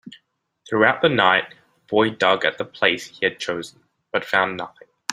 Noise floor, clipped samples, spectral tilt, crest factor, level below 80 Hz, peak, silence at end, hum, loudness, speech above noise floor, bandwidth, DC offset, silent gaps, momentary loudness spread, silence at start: -64 dBFS; under 0.1%; -4 dB/octave; 20 dB; -64 dBFS; -2 dBFS; 0 s; none; -20 LUFS; 44 dB; 15.5 kHz; under 0.1%; none; 16 LU; 0.05 s